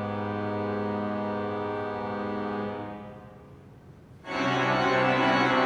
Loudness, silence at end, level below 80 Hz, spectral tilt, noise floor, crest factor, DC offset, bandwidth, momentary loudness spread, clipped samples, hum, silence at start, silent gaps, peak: -28 LUFS; 0 s; -60 dBFS; -6 dB/octave; -50 dBFS; 18 dB; under 0.1%; 10.5 kHz; 18 LU; under 0.1%; none; 0 s; none; -10 dBFS